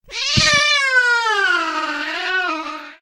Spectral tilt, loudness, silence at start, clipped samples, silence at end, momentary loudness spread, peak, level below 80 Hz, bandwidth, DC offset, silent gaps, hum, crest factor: -1.5 dB/octave; -16 LUFS; 0.05 s; under 0.1%; 0.05 s; 10 LU; 0 dBFS; -44 dBFS; 15 kHz; under 0.1%; none; none; 18 dB